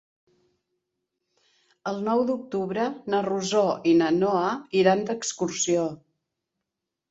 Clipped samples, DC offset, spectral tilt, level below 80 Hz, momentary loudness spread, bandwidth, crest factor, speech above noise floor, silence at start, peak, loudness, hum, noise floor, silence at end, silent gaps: under 0.1%; under 0.1%; -4.5 dB/octave; -68 dBFS; 8 LU; 8.2 kHz; 20 dB; 61 dB; 1.85 s; -6 dBFS; -25 LUFS; none; -85 dBFS; 1.15 s; none